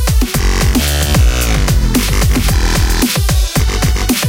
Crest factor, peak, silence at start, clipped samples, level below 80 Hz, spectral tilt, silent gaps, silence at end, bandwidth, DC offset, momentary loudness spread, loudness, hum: 10 dB; -2 dBFS; 0 s; under 0.1%; -14 dBFS; -4 dB/octave; none; 0 s; 17 kHz; under 0.1%; 2 LU; -13 LUFS; none